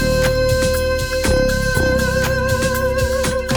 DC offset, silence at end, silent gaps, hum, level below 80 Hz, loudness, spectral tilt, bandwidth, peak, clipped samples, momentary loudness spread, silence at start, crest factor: under 0.1%; 0 s; none; none; -24 dBFS; -17 LUFS; -4.5 dB/octave; 19.5 kHz; -2 dBFS; under 0.1%; 2 LU; 0 s; 14 dB